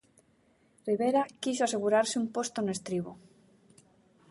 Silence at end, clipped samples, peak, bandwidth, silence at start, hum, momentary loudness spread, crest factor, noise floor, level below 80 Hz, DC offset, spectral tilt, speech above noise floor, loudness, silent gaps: 1.15 s; under 0.1%; -14 dBFS; 11.5 kHz; 0.85 s; none; 9 LU; 18 dB; -67 dBFS; -74 dBFS; under 0.1%; -4 dB/octave; 37 dB; -30 LUFS; none